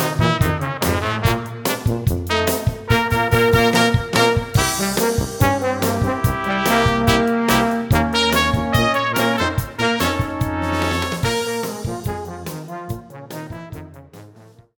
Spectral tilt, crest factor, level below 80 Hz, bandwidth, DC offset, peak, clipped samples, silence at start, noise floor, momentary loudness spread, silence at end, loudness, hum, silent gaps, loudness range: -4.5 dB/octave; 18 dB; -34 dBFS; 20 kHz; under 0.1%; -2 dBFS; under 0.1%; 0 s; -46 dBFS; 14 LU; 0.35 s; -18 LUFS; none; none; 7 LU